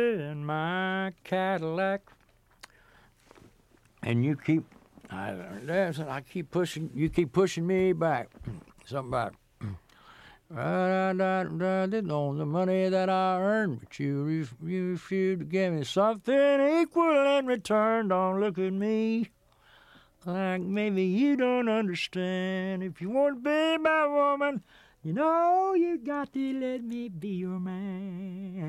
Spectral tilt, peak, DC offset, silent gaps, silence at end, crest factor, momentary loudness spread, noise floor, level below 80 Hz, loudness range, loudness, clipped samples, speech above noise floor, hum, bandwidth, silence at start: -7 dB/octave; -12 dBFS; under 0.1%; none; 0 s; 18 dB; 13 LU; -62 dBFS; -62 dBFS; 7 LU; -28 LUFS; under 0.1%; 34 dB; none; 13 kHz; 0 s